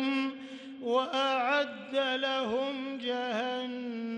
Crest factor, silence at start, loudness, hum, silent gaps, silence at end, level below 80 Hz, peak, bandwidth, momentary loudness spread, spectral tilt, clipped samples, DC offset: 16 dB; 0 s; -31 LUFS; none; none; 0 s; -78 dBFS; -16 dBFS; 9.8 kHz; 9 LU; -3.5 dB/octave; under 0.1%; under 0.1%